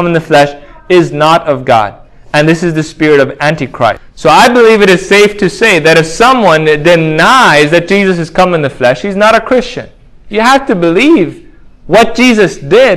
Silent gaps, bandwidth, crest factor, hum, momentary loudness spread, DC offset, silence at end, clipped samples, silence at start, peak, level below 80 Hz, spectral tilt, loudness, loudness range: none; 16 kHz; 8 dB; none; 8 LU; under 0.1%; 0 s; 4%; 0 s; 0 dBFS; -38 dBFS; -5 dB/octave; -7 LUFS; 4 LU